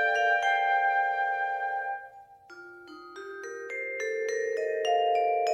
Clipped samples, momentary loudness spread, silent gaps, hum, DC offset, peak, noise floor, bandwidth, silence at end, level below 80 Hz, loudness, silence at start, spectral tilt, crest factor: under 0.1%; 22 LU; none; none; under 0.1%; -14 dBFS; -51 dBFS; 10 kHz; 0 s; -80 dBFS; -28 LUFS; 0 s; -0.5 dB/octave; 16 dB